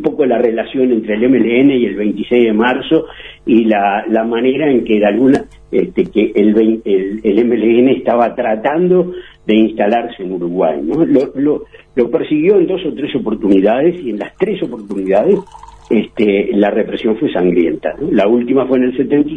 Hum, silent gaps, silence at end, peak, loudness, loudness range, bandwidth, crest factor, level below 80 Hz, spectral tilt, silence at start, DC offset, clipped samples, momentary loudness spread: none; none; 0 s; 0 dBFS; -13 LUFS; 2 LU; 5 kHz; 12 dB; -46 dBFS; -8.5 dB/octave; 0 s; 0.1%; under 0.1%; 8 LU